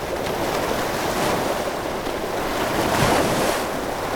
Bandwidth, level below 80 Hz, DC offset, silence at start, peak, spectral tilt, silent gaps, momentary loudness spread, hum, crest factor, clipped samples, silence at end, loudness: 19.5 kHz; -40 dBFS; under 0.1%; 0 s; -6 dBFS; -4 dB/octave; none; 7 LU; none; 18 dB; under 0.1%; 0 s; -22 LUFS